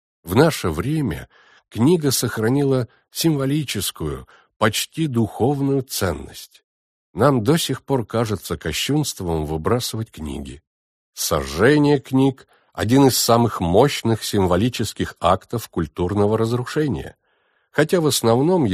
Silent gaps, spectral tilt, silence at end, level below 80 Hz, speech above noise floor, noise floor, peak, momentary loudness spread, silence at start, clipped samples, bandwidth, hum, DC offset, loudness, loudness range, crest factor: 4.56-4.60 s, 6.64-7.14 s, 10.67-11.13 s; -5 dB/octave; 0 s; -44 dBFS; 46 dB; -65 dBFS; -2 dBFS; 13 LU; 0.25 s; under 0.1%; 15.5 kHz; none; under 0.1%; -20 LUFS; 5 LU; 18 dB